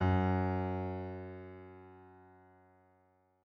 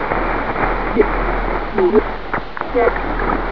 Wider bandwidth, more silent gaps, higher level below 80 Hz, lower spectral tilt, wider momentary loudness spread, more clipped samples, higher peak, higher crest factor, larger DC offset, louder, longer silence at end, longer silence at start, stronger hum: about the same, 5 kHz vs 5.4 kHz; neither; second, -68 dBFS vs -26 dBFS; first, -10 dB/octave vs -8.5 dB/octave; first, 25 LU vs 7 LU; neither; second, -20 dBFS vs -2 dBFS; about the same, 18 dB vs 16 dB; second, under 0.1% vs 4%; second, -36 LUFS vs -18 LUFS; first, 1.2 s vs 0 s; about the same, 0 s vs 0 s; neither